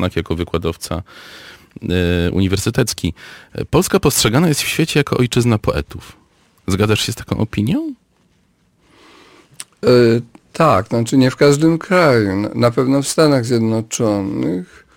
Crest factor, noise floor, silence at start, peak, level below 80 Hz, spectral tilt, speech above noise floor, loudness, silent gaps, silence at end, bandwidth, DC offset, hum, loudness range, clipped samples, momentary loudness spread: 14 dB; -58 dBFS; 0 s; -2 dBFS; -38 dBFS; -5.5 dB/octave; 43 dB; -16 LUFS; none; 0.3 s; 17 kHz; under 0.1%; none; 7 LU; under 0.1%; 16 LU